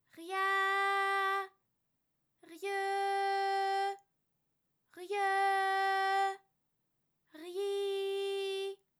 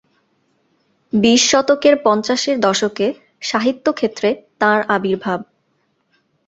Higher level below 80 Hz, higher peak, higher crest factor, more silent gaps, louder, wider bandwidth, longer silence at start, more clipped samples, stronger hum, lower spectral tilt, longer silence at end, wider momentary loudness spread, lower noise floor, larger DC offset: second, under -90 dBFS vs -58 dBFS; second, -22 dBFS vs -2 dBFS; about the same, 14 dB vs 16 dB; neither; second, -33 LUFS vs -16 LUFS; first, 17 kHz vs 8.2 kHz; second, 0.15 s vs 1.15 s; neither; neither; second, -0.5 dB/octave vs -3 dB/octave; second, 0.25 s vs 1.05 s; first, 12 LU vs 9 LU; first, -82 dBFS vs -65 dBFS; neither